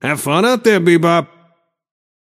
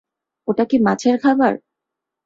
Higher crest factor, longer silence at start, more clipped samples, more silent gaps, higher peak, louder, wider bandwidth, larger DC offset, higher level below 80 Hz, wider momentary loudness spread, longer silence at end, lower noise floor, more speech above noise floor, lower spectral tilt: about the same, 16 dB vs 16 dB; second, 0.05 s vs 0.45 s; neither; neither; about the same, 0 dBFS vs -2 dBFS; first, -13 LUFS vs -17 LUFS; first, 15 kHz vs 7.8 kHz; neither; about the same, -64 dBFS vs -60 dBFS; second, 4 LU vs 12 LU; first, 1 s vs 0.7 s; second, -57 dBFS vs -83 dBFS; second, 44 dB vs 67 dB; about the same, -5.5 dB/octave vs -6 dB/octave